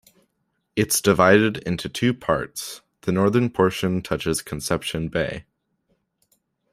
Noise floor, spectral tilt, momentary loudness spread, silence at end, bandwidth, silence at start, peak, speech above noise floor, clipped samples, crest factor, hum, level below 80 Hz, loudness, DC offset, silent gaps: -73 dBFS; -4.5 dB/octave; 14 LU; 1.3 s; 16 kHz; 0.75 s; -2 dBFS; 52 dB; under 0.1%; 20 dB; none; -50 dBFS; -22 LUFS; under 0.1%; none